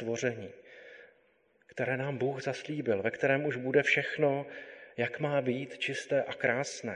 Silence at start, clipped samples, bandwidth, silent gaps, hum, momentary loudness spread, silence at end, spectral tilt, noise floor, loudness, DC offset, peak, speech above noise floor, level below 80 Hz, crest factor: 0 s; under 0.1%; 10.5 kHz; none; none; 18 LU; 0 s; -5 dB/octave; -69 dBFS; -31 LUFS; under 0.1%; -12 dBFS; 37 dB; -74 dBFS; 20 dB